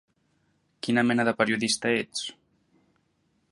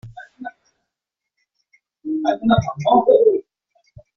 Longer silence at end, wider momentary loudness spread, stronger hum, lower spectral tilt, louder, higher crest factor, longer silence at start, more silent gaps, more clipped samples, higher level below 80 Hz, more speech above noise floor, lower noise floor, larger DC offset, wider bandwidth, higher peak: first, 1.2 s vs 0.75 s; second, 11 LU vs 22 LU; neither; second, -3.5 dB/octave vs -6 dB/octave; second, -26 LUFS vs -17 LUFS; about the same, 22 dB vs 18 dB; first, 0.85 s vs 0.05 s; neither; neither; second, -70 dBFS vs -48 dBFS; second, 46 dB vs 68 dB; second, -71 dBFS vs -83 dBFS; neither; first, 11.5 kHz vs 6.6 kHz; second, -6 dBFS vs -2 dBFS